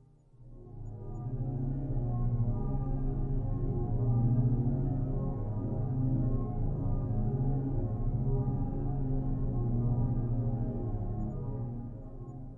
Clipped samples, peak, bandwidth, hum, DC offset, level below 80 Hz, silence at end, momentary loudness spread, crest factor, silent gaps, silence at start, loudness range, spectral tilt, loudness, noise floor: under 0.1%; -18 dBFS; 1.9 kHz; none; under 0.1%; -36 dBFS; 0 s; 10 LU; 14 dB; none; 0.4 s; 3 LU; -13.5 dB/octave; -33 LUFS; -55 dBFS